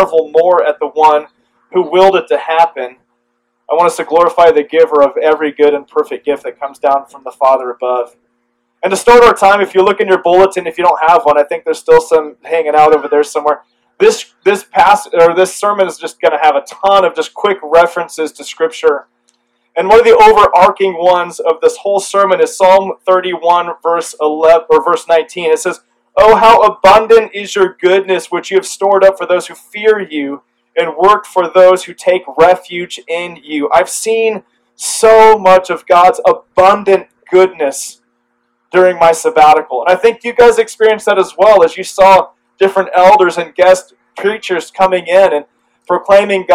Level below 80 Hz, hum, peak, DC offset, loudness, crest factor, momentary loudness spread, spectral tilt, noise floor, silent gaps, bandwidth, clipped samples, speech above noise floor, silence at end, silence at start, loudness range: -46 dBFS; none; 0 dBFS; under 0.1%; -10 LUFS; 10 dB; 11 LU; -3.5 dB/octave; -64 dBFS; none; 15 kHz; 2%; 55 dB; 0 s; 0 s; 4 LU